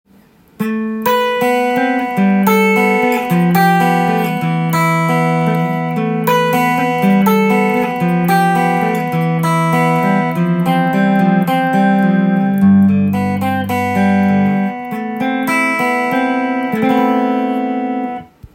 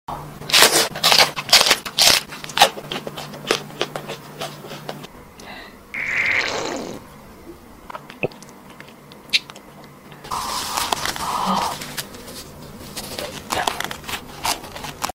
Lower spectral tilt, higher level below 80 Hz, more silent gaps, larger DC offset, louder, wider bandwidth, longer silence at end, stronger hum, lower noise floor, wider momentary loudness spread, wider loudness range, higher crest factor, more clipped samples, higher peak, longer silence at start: first, -7 dB/octave vs -1 dB/octave; second, -56 dBFS vs -50 dBFS; neither; neither; first, -14 LUFS vs -19 LUFS; about the same, 17 kHz vs 16.5 kHz; about the same, 0.1 s vs 0.05 s; neither; first, -47 dBFS vs -42 dBFS; second, 6 LU vs 24 LU; second, 2 LU vs 13 LU; second, 14 dB vs 22 dB; neither; about the same, 0 dBFS vs 0 dBFS; first, 0.6 s vs 0.1 s